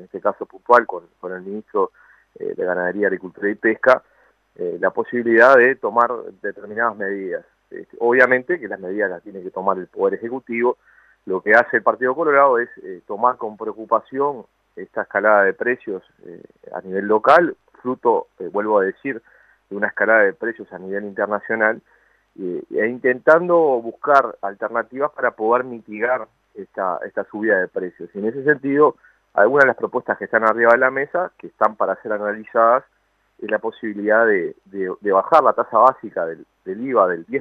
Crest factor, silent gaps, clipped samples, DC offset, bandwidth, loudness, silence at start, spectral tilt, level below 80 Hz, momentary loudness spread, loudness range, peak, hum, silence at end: 20 dB; none; under 0.1%; under 0.1%; 7.2 kHz; -19 LUFS; 0 s; -7 dB/octave; -68 dBFS; 16 LU; 4 LU; 0 dBFS; none; 0 s